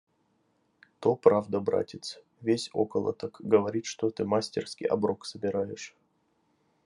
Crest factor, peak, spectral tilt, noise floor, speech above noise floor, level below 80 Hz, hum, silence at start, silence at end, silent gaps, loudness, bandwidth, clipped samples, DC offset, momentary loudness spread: 24 dB; -6 dBFS; -5.5 dB/octave; -72 dBFS; 43 dB; -76 dBFS; none; 1 s; 0.95 s; none; -29 LUFS; 11.5 kHz; under 0.1%; under 0.1%; 13 LU